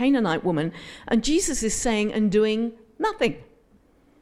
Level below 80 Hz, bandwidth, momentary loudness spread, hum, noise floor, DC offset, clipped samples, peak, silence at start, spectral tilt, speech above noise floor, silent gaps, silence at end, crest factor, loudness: -44 dBFS; 15 kHz; 9 LU; none; -58 dBFS; under 0.1%; under 0.1%; -8 dBFS; 0 s; -4 dB/octave; 35 dB; none; 0.8 s; 16 dB; -24 LUFS